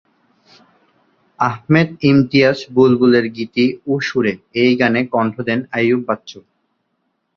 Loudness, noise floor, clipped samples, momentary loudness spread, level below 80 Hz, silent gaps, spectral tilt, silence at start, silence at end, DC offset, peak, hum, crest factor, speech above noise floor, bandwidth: -16 LUFS; -69 dBFS; under 0.1%; 8 LU; -54 dBFS; none; -7 dB/octave; 1.4 s; 0.95 s; under 0.1%; 0 dBFS; none; 16 dB; 54 dB; 6.8 kHz